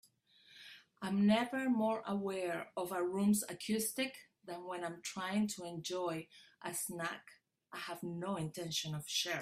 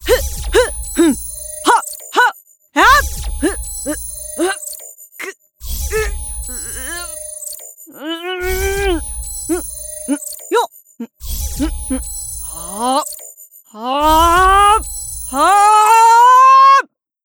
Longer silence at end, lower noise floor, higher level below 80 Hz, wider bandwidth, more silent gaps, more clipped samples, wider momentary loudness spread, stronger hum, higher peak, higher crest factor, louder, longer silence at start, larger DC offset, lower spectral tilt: second, 0 s vs 0.4 s; first, -67 dBFS vs -40 dBFS; second, -78 dBFS vs -28 dBFS; second, 16 kHz vs 20 kHz; neither; neither; second, 16 LU vs 19 LU; neither; second, -20 dBFS vs 0 dBFS; about the same, 18 dB vs 16 dB; second, -38 LUFS vs -14 LUFS; first, 0.5 s vs 0 s; neither; about the same, -4 dB/octave vs -3 dB/octave